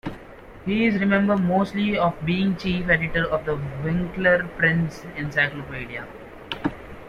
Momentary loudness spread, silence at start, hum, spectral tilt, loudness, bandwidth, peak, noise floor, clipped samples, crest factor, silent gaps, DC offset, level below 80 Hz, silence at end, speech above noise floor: 14 LU; 0.05 s; none; -7.5 dB/octave; -23 LUFS; 10 kHz; -6 dBFS; -43 dBFS; under 0.1%; 16 dB; none; under 0.1%; -44 dBFS; 0 s; 20 dB